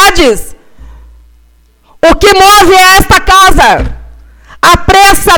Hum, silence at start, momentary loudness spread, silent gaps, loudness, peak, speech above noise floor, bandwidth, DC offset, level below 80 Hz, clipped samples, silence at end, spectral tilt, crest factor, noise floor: none; 0 s; 8 LU; none; -4 LUFS; 0 dBFS; 40 dB; over 20 kHz; under 0.1%; -18 dBFS; 6%; 0 s; -3 dB/octave; 6 dB; -44 dBFS